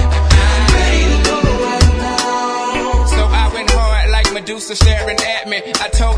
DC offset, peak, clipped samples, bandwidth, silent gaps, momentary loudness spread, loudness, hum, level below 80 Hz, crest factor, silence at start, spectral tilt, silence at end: under 0.1%; 0 dBFS; under 0.1%; 11 kHz; none; 6 LU; -14 LUFS; none; -14 dBFS; 12 dB; 0 s; -4.5 dB/octave; 0 s